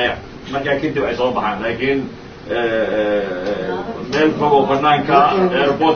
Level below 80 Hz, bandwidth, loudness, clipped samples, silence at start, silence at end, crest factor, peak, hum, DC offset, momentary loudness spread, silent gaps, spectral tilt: -44 dBFS; 6.8 kHz; -17 LUFS; under 0.1%; 0 s; 0 s; 16 dB; 0 dBFS; none; under 0.1%; 11 LU; none; -6.5 dB/octave